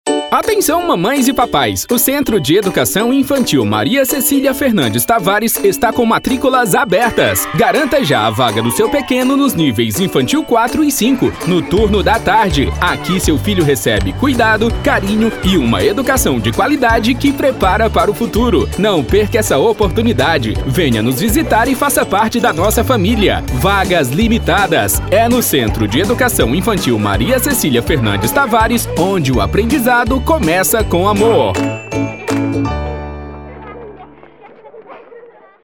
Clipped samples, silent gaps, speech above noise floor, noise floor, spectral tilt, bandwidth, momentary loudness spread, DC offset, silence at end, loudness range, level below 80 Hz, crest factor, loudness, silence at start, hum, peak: under 0.1%; none; 27 dB; -39 dBFS; -4.5 dB/octave; over 20 kHz; 3 LU; 0.2%; 0.4 s; 1 LU; -28 dBFS; 12 dB; -13 LUFS; 0.05 s; none; 0 dBFS